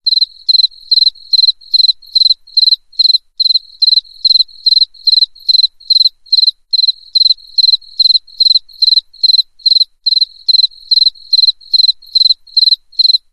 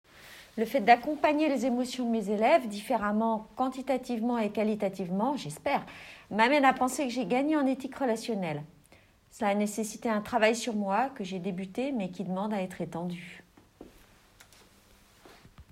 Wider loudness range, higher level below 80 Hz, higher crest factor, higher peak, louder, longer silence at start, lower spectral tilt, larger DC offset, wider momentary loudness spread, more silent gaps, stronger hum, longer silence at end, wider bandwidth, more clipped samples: second, 0 LU vs 9 LU; first, -56 dBFS vs -66 dBFS; second, 10 dB vs 22 dB; first, -2 dBFS vs -8 dBFS; first, -9 LUFS vs -29 LUFS; about the same, 0.05 s vs 0.15 s; second, 4 dB/octave vs -5 dB/octave; first, 0.4% vs under 0.1%; second, 2 LU vs 12 LU; neither; neither; about the same, 0.15 s vs 0.1 s; second, 13 kHz vs 16 kHz; neither